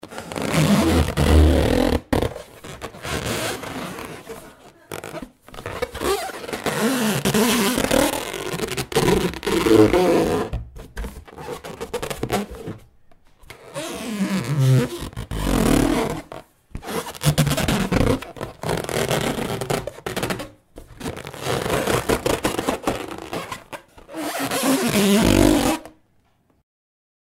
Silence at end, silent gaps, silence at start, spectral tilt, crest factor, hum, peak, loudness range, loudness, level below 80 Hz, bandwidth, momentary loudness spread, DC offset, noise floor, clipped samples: 1.5 s; none; 0.05 s; -5 dB/octave; 20 dB; none; -2 dBFS; 9 LU; -21 LUFS; -32 dBFS; 16.5 kHz; 19 LU; under 0.1%; -61 dBFS; under 0.1%